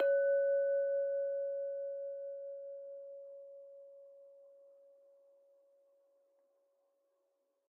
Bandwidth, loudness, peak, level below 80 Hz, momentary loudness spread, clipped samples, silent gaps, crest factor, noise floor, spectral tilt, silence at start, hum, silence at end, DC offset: 2.7 kHz; -36 LUFS; -24 dBFS; under -90 dBFS; 24 LU; under 0.1%; none; 16 dB; -81 dBFS; 8 dB/octave; 0 s; none; 3.25 s; under 0.1%